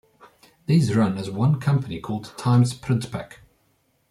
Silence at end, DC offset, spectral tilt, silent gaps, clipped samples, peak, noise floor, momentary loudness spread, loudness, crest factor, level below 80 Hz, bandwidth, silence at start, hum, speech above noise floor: 0.75 s; under 0.1%; -7.5 dB/octave; none; under 0.1%; -8 dBFS; -66 dBFS; 14 LU; -23 LUFS; 16 dB; -56 dBFS; 12.5 kHz; 0.7 s; none; 45 dB